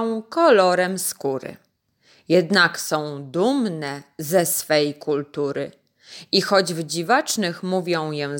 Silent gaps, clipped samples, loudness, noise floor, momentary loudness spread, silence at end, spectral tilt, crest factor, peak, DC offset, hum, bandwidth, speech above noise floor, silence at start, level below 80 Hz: none; under 0.1%; -21 LUFS; -60 dBFS; 13 LU; 0 s; -3.5 dB/octave; 18 dB; -4 dBFS; under 0.1%; none; 17 kHz; 39 dB; 0 s; -72 dBFS